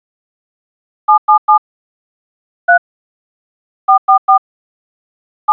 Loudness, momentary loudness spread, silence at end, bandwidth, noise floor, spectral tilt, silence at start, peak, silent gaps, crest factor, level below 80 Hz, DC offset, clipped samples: -13 LUFS; 11 LU; 0 s; 4 kHz; under -90 dBFS; -2.5 dB/octave; 1.1 s; 0 dBFS; 1.18-1.28 s, 1.38-1.48 s, 1.58-2.68 s, 2.78-3.88 s, 3.98-4.08 s, 4.18-4.28 s, 4.38-5.48 s; 16 dB; -78 dBFS; under 0.1%; under 0.1%